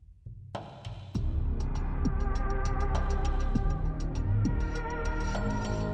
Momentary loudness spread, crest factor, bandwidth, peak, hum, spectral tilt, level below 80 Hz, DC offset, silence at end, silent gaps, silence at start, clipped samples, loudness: 12 LU; 14 dB; 8 kHz; -16 dBFS; none; -7 dB/octave; -32 dBFS; under 0.1%; 0 s; none; 0.1 s; under 0.1%; -33 LUFS